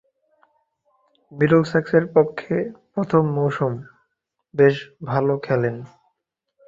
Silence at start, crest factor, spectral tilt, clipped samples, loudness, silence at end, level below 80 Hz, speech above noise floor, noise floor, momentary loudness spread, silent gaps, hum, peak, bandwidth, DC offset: 1.3 s; 20 dB; -8.5 dB/octave; under 0.1%; -21 LUFS; 0.8 s; -60 dBFS; 58 dB; -77 dBFS; 11 LU; none; none; -2 dBFS; 7.6 kHz; under 0.1%